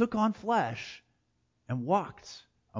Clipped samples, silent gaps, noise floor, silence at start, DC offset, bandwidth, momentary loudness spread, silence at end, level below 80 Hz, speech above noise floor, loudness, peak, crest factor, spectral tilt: under 0.1%; none; -75 dBFS; 0 s; under 0.1%; 7.6 kHz; 20 LU; 0 s; -66 dBFS; 45 dB; -31 LUFS; -12 dBFS; 20 dB; -6.5 dB/octave